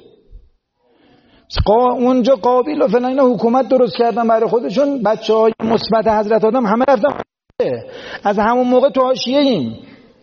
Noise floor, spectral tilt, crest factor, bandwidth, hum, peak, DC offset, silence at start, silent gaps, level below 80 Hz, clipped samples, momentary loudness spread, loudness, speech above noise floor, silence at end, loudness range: -59 dBFS; -4.5 dB/octave; 14 dB; 6.8 kHz; none; -2 dBFS; under 0.1%; 0.3 s; none; -38 dBFS; under 0.1%; 8 LU; -15 LUFS; 45 dB; 0.4 s; 2 LU